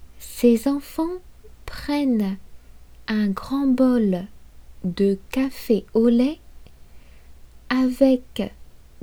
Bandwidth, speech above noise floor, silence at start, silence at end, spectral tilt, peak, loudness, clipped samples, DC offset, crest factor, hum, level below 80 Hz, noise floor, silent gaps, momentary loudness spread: 19 kHz; 24 dB; 0 s; 0.4 s; -6.5 dB/octave; -4 dBFS; -22 LUFS; under 0.1%; under 0.1%; 18 dB; none; -46 dBFS; -44 dBFS; none; 18 LU